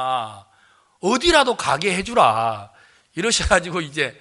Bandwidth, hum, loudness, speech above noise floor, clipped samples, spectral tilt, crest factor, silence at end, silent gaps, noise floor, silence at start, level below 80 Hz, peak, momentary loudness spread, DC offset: 11.5 kHz; none; -19 LUFS; 37 dB; under 0.1%; -3 dB/octave; 20 dB; 0.1 s; none; -57 dBFS; 0 s; -40 dBFS; 0 dBFS; 11 LU; under 0.1%